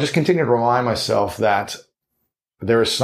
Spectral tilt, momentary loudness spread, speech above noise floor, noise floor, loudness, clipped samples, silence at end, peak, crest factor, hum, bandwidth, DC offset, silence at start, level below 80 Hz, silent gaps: -5 dB/octave; 13 LU; 57 dB; -75 dBFS; -19 LUFS; under 0.1%; 0 s; -2 dBFS; 16 dB; none; 15.5 kHz; under 0.1%; 0 s; -52 dBFS; none